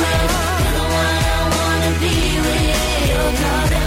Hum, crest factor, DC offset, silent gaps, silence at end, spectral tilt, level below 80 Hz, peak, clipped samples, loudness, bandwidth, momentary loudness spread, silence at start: none; 8 dB; under 0.1%; none; 0 s; -4 dB/octave; -22 dBFS; -8 dBFS; under 0.1%; -17 LUFS; 16.5 kHz; 1 LU; 0 s